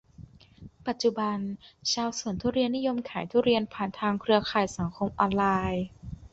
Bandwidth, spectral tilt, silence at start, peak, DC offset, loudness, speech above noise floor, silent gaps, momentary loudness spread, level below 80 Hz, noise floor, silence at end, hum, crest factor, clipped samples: 8 kHz; -5 dB/octave; 0.2 s; -8 dBFS; under 0.1%; -28 LUFS; 23 dB; none; 9 LU; -52 dBFS; -51 dBFS; 0.05 s; none; 20 dB; under 0.1%